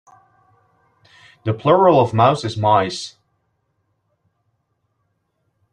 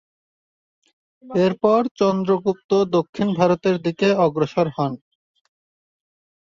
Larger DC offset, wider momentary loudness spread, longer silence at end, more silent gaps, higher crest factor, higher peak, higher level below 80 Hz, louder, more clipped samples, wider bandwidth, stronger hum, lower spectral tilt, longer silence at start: neither; first, 16 LU vs 6 LU; first, 2.65 s vs 1.55 s; second, none vs 1.91-1.95 s, 2.64-2.69 s, 3.09-3.13 s; about the same, 20 dB vs 18 dB; about the same, -2 dBFS vs -2 dBFS; about the same, -60 dBFS vs -62 dBFS; first, -16 LUFS vs -20 LUFS; neither; first, 10.5 kHz vs 7.4 kHz; neither; about the same, -6.5 dB/octave vs -7 dB/octave; first, 1.45 s vs 1.25 s